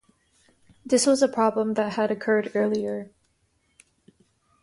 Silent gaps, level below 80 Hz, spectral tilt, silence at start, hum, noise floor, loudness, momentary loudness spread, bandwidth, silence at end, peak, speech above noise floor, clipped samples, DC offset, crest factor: none; -68 dBFS; -4 dB/octave; 0.85 s; none; -69 dBFS; -24 LUFS; 10 LU; 11.5 kHz; 1.55 s; -8 dBFS; 46 dB; under 0.1%; under 0.1%; 18 dB